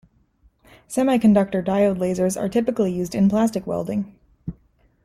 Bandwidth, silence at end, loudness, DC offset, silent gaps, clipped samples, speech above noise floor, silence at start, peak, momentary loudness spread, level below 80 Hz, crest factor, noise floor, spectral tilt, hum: 14 kHz; 0.55 s; -21 LUFS; under 0.1%; none; under 0.1%; 39 dB; 0.9 s; -6 dBFS; 19 LU; -52 dBFS; 16 dB; -59 dBFS; -7 dB/octave; none